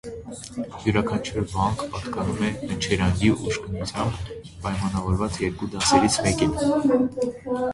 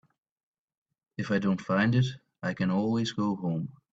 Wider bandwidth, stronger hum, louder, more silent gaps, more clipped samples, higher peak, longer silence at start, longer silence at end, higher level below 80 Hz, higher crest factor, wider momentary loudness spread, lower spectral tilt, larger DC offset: first, 11.5 kHz vs 7.8 kHz; neither; first, -24 LUFS vs -29 LUFS; neither; neither; first, -4 dBFS vs -12 dBFS; second, 0.05 s vs 1.2 s; second, 0 s vs 0.2 s; first, -40 dBFS vs -66 dBFS; about the same, 20 dB vs 18 dB; about the same, 12 LU vs 10 LU; second, -5 dB/octave vs -7 dB/octave; neither